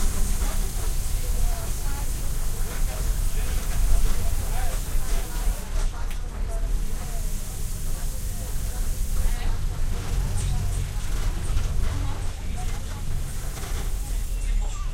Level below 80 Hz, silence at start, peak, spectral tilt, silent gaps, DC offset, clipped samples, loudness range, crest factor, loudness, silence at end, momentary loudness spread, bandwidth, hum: -24 dBFS; 0 s; -8 dBFS; -4 dB/octave; none; under 0.1%; under 0.1%; 3 LU; 16 dB; -30 LUFS; 0 s; 5 LU; 16.5 kHz; none